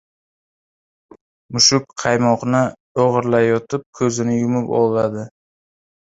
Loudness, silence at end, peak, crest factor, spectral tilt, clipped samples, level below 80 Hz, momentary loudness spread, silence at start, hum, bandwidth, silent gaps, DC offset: -17 LUFS; 0.85 s; 0 dBFS; 18 dB; -4 dB/octave; under 0.1%; -56 dBFS; 10 LU; 1.5 s; none; 8 kHz; 2.80-2.95 s, 3.86-3.93 s; under 0.1%